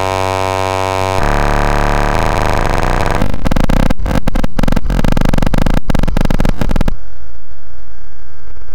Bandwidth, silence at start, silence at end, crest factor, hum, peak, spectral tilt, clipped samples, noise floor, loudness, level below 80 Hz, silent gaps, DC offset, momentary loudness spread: 16.5 kHz; 0 s; 0 s; 4 dB; none; -4 dBFS; -6 dB/octave; under 0.1%; -38 dBFS; -15 LUFS; -14 dBFS; none; under 0.1%; 3 LU